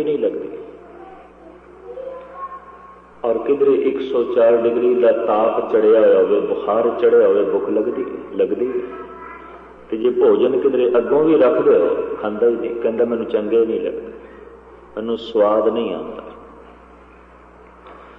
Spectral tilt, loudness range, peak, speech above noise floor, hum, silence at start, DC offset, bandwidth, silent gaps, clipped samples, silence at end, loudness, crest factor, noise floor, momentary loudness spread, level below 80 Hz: -8.5 dB/octave; 8 LU; -4 dBFS; 28 dB; 60 Hz at -55 dBFS; 0 s; under 0.1%; 4.1 kHz; none; under 0.1%; 0.1 s; -17 LUFS; 14 dB; -44 dBFS; 19 LU; -54 dBFS